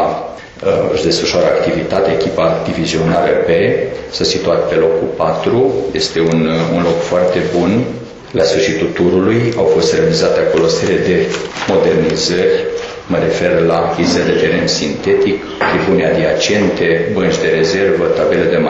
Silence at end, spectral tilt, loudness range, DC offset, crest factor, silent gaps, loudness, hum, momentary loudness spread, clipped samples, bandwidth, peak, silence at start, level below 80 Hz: 0 s; -5 dB/octave; 1 LU; under 0.1%; 10 dB; none; -13 LUFS; none; 4 LU; under 0.1%; 8.2 kHz; -2 dBFS; 0 s; -40 dBFS